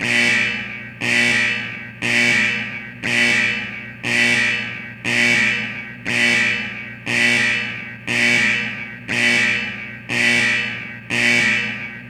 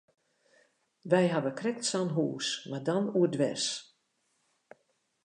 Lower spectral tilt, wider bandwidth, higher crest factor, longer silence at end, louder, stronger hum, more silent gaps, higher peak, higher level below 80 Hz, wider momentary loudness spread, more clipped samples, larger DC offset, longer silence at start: second, -2.5 dB/octave vs -4.5 dB/octave; first, 17 kHz vs 11 kHz; about the same, 18 dB vs 22 dB; second, 0 s vs 1.4 s; first, -17 LUFS vs -30 LUFS; first, 60 Hz at -40 dBFS vs none; neither; first, -2 dBFS vs -12 dBFS; first, -54 dBFS vs -84 dBFS; first, 13 LU vs 7 LU; neither; neither; second, 0 s vs 1.05 s